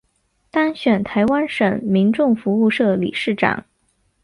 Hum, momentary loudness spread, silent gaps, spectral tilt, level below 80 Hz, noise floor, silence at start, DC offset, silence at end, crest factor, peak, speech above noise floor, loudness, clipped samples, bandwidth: none; 4 LU; none; -7.5 dB/octave; -54 dBFS; -65 dBFS; 0.55 s; under 0.1%; 0.65 s; 16 dB; -2 dBFS; 48 dB; -18 LUFS; under 0.1%; 11 kHz